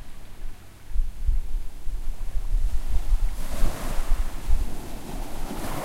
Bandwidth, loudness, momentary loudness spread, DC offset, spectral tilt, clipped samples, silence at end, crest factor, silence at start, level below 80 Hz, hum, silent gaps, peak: 14.5 kHz; -33 LUFS; 12 LU; under 0.1%; -5 dB/octave; under 0.1%; 0 s; 16 dB; 0 s; -24 dBFS; none; none; -6 dBFS